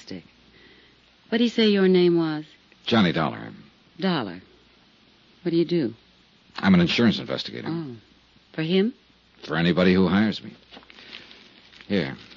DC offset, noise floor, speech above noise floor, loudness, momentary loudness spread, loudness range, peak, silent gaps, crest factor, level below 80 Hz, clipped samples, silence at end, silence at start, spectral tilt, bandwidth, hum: under 0.1%; -57 dBFS; 35 dB; -23 LUFS; 23 LU; 5 LU; -6 dBFS; none; 18 dB; -60 dBFS; under 0.1%; 0.15 s; 0.1 s; -7 dB/octave; 7.2 kHz; none